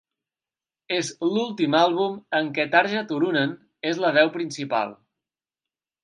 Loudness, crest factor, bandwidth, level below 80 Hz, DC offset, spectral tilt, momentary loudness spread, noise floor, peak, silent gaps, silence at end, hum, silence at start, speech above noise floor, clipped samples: -23 LUFS; 22 dB; 10.5 kHz; -78 dBFS; under 0.1%; -4.5 dB/octave; 9 LU; under -90 dBFS; -4 dBFS; none; 1.1 s; none; 0.9 s; over 67 dB; under 0.1%